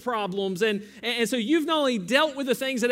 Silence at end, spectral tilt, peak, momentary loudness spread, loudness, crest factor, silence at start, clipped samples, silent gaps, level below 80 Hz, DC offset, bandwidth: 0 s; -4 dB/octave; -8 dBFS; 6 LU; -25 LUFS; 16 dB; 0 s; under 0.1%; none; -70 dBFS; under 0.1%; 16 kHz